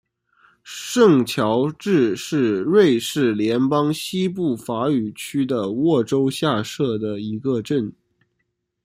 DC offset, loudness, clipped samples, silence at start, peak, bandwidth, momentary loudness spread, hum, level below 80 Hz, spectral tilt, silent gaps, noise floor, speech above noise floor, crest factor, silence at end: under 0.1%; -20 LUFS; under 0.1%; 0.65 s; -2 dBFS; 16 kHz; 9 LU; none; -62 dBFS; -6 dB/octave; none; -74 dBFS; 55 dB; 18 dB; 0.95 s